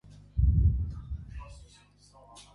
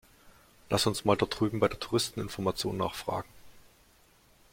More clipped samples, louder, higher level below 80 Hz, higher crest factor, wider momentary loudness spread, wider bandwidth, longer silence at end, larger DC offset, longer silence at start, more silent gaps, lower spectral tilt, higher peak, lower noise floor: neither; about the same, -30 LUFS vs -30 LUFS; first, -32 dBFS vs -56 dBFS; second, 16 dB vs 24 dB; first, 23 LU vs 8 LU; second, 10.5 kHz vs 16.5 kHz; second, 0.15 s vs 0.95 s; neither; about the same, 0.35 s vs 0.25 s; neither; first, -8 dB/octave vs -4.5 dB/octave; second, -14 dBFS vs -8 dBFS; second, -58 dBFS vs -62 dBFS